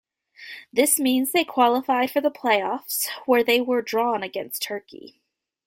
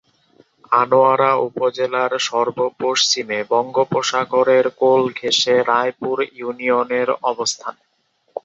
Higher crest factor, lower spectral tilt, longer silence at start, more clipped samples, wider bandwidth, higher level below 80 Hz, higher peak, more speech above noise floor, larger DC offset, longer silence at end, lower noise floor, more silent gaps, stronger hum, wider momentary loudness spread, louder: about the same, 18 dB vs 16 dB; second, -1.5 dB/octave vs -3 dB/octave; second, 0.4 s vs 0.7 s; neither; first, 16.5 kHz vs 7.8 kHz; about the same, -70 dBFS vs -68 dBFS; second, -6 dBFS vs -2 dBFS; second, 23 dB vs 37 dB; neither; first, 0.55 s vs 0.05 s; second, -45 dBFS vs -55 dBFS; neither; neither; about the same, 10 LU vs 8 LU; second, -22 LUFS vs -18 LUFS